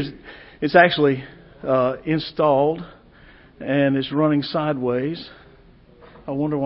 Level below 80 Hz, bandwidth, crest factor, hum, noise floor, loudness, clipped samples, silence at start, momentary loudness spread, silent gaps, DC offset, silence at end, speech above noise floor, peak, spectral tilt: -54 dBFS; 5.8 kHz; 20 dB; none; -50 dBFS; -20 LUFS; under 0.1%; 0 s; 22 LU; none; under 0.1%; 0 s; 29 dB; -2 dBFS; -11 dB/octave